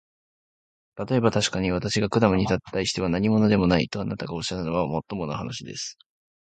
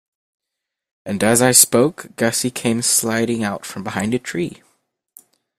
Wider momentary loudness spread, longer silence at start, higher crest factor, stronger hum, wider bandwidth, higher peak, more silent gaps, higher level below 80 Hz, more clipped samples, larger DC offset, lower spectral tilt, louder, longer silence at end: second, 12 LU vs 16 LU; about the same, 0.95 s vs 1.05 s; about the same, 20 dB vs 20 dB; neither; second, 9.2 kHz vs 16 kHz; second, -4 dBFS vs 0 dBFS; neither; first, -46 dBFS vs -56 dBFS; neither; neither; first, -5.5 dB/octave vs -3 dB/octave; second, -24 LUFS vs -17 LUFS; second, 0.6 s vs 1.05 s